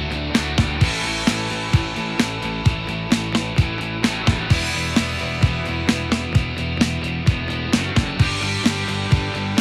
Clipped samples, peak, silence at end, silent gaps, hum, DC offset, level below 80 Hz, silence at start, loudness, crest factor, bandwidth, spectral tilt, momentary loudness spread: under 0.1%; -2 dBFS; 0 s; none; none; under 0.1%; -32 dBFS; 0 s; -21 LUFS; 18 dB; 14 kHz; -5 dB/octave; 3 LU